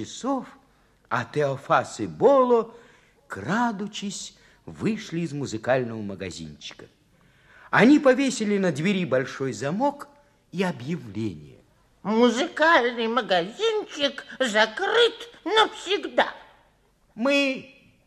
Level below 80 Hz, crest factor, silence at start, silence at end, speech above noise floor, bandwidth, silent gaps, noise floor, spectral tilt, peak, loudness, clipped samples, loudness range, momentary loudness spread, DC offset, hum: -62 dBFS; 22 dB; 0 s; 0.4 s; 39 dB; 12.5 kHz; none; -62 dBFS; -4.5 dB/octave; -4 dBFS; -24 LUFS; under 0.1%; 7 LU; 16 LU; under 0.1%; none